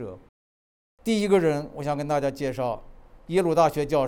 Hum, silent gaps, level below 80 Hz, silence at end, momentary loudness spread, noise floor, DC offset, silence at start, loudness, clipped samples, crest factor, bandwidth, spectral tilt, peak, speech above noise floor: none; 0.29-0.98 s; -50 dBFS; 0 s; 10 LU; under -90 dBFS; under 0.1%; 0 s; -25 LUFS; under 0.1%; 18 dB; 19.5 kHz; -6 dB/octave; -6 dBFS; over 66 dB